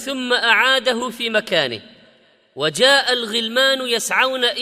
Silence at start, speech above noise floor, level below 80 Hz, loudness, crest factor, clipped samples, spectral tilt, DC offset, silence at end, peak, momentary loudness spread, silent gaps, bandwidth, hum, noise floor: 0 s; 36 dB; -64 dBFS; -17 LUFS; 18 dB; under 0.1%; -1.5 dB/octave; under 0.1%; 0 s; 0 dBFS; 9 LU; none; 15.5 kHz; none; -54 dBFS